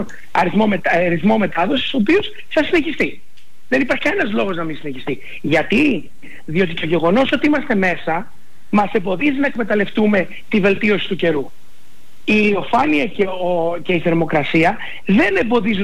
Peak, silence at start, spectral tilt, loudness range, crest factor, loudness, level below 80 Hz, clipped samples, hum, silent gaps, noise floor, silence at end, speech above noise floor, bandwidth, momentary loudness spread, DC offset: -6 dBFS; 0 s; -6.5 dB/octave; 2 LU; 12 dB; -17 LUFS; -46 dBFS; under 0.1%; none; none; -52 dBFS; 0 s; 35 dB; 12.5 kHz; 8 LU; 5%